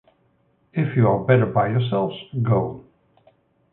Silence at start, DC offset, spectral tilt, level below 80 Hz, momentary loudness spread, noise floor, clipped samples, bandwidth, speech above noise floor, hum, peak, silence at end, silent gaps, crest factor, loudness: 0.75 s; under 0.1%; -12.5 dB/octave; -54 dBFS; 12 LU; -63 dBFS; under 0.1%; 4 kHz; 44 dB; none; -2 dBFS; 0.9 s; none; 20 dB; -21 LUFS